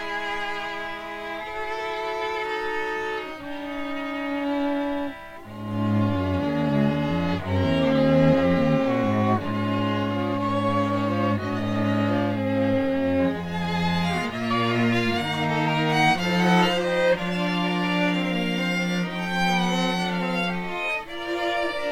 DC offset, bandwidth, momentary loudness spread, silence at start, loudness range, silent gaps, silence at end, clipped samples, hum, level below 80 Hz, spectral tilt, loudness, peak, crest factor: under 0.1%; 16 kHz; 10 LU; 0 s; 7 LU; none; 0 s; under 0.1%; none; -50 dBFS; -6.5 dB/octave; -24 LUFS; -8 dBFS; 16 dB